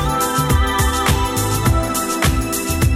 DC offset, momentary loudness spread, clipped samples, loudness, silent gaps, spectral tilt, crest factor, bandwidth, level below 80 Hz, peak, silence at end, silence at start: under 0.1%; 3 LU; under 0.1%; -17 LUFS; none; -4.5 dB/octave; 14 dB; 17 kHz; -22 dBFS; -2 dBFS; 0 s; 0 s